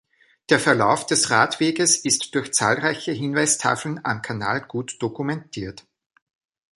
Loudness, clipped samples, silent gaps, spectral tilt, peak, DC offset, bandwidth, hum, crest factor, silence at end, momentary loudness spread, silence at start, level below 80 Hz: -21 LUFS; under 0.1%; none; -3 dB/octave; -2 dBFS; under 0.1%; 12 kHz; none; 20 dB; 0.95 s; 11 LU; 0.5 s; -60 dBFS